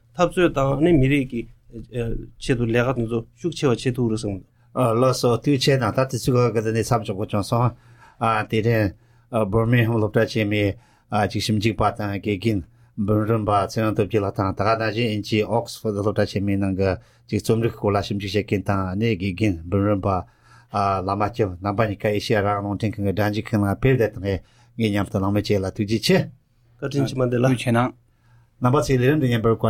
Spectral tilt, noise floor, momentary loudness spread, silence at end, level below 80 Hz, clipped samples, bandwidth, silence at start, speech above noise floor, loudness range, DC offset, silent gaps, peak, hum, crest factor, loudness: -6.5 dB/octave; -56 dBFS; 8 LU; 0 s; -42 dBFS; under 0.1%; 15.5 kHz; 0.15 s; 35 dB; 2 LU; under 0.1%; none; -4 dBFS; none; 18 dB; -22 LUFS